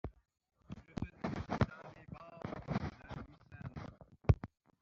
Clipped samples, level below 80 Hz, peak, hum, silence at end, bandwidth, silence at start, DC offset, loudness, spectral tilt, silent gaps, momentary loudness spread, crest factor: under 0.1%; -50 dBFS; -14 dBFS; none; 0.35 s; 7.2 kHz; 0.05 s; under 0.1%; -41 LUFS; -7.5 dB/octave; none; 19 LU; 28 dB